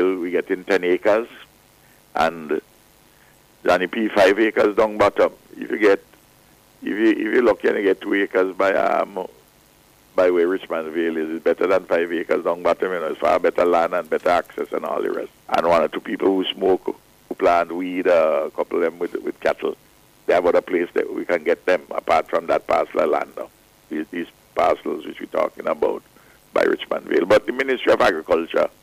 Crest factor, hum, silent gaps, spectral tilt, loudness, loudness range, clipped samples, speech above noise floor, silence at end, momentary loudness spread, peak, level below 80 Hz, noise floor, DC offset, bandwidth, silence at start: 14 dB; none; none; -5 dB/octave; -20 LUFS; 4 LU; under 0.1%; 34 dB; 0.15 s; 11 LU; -8 dBFS; -56 dBFS; -53 dBFS; under 0.1%; 15.5 kHz; 0 s